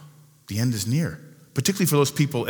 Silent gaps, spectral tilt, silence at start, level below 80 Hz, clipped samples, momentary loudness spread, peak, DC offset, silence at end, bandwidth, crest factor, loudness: none; -5 dB/octave; 0 s; -60 dBFS; under 0.1%; 11 LU; -8 dBFS; under 0.1%; 0 s; over 20 kHz; 16 dB; -24 LUFS